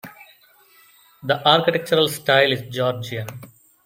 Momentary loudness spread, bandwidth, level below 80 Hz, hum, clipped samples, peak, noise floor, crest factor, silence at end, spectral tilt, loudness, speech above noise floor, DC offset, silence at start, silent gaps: 17 LU; 17 kHz; -64 dBFS; none; under 0.1%; -2 dBFS; -54 dBFS; 20 dB; 0.4 s; -4.5 dB/octave; -19 LUFS; 34 dB; under 0.1%; 0.05 s; none